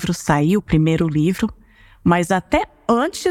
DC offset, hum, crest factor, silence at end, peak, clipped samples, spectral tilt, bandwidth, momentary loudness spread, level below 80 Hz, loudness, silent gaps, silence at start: under 0.1%; none; 14 dB; 0 s; -4 dBFS; under 0.1%; -6.5 dB/octave; 15.5 kHz; 5 LU; -40 dBFS; -18 LUFS; none; 0 s